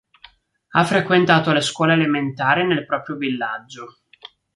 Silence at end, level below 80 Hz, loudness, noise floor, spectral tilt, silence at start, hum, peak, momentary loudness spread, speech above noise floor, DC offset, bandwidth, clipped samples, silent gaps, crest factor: 0.65 s; -62 dBFS; -18 LUFS; -51 dBFS; -5.5 dB/octave; 0.75 s; none; -2 dBFS; 11 LU; 32 dB; under 0.1%; 11.5 kHz; under 0.1%; none; 18 dB